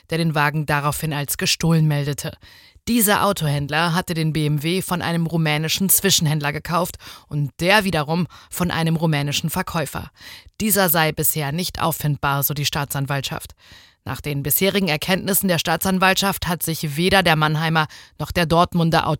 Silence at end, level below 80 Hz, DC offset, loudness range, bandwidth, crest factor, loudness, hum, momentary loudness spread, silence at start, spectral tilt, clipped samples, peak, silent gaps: 0.05 s; -46 dBFS; under 0.1%; 3 LU; 17 kHz; 18 dB; -19 LUFS; none; 12 LU; 0.1 s; -4 dB/octave; under 0.1%; -2 dBFS; none